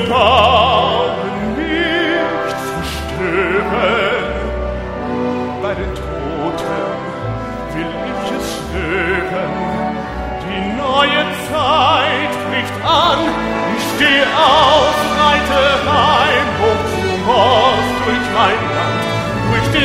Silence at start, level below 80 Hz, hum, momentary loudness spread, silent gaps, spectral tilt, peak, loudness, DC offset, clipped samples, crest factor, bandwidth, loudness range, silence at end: 0 s; -32 dBFS; none; 11 LU; none; -4.5 dB/octave; 0 dBFS; -15 LUFS; under 0.1%; under 0.1%; 16 dB; 16 kHz; 9 LU; 0 s